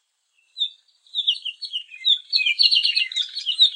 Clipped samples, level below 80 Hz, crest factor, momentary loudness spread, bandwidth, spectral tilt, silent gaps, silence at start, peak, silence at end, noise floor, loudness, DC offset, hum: under 0.1%; under -90 dBFS; 22 dB; 13 LU; 10.5 kHz; 12 dB/octave; none; 0.55 s; -2 dBFS; 0 s; -67 dBFS; -20 LUFS; under 0.1%; none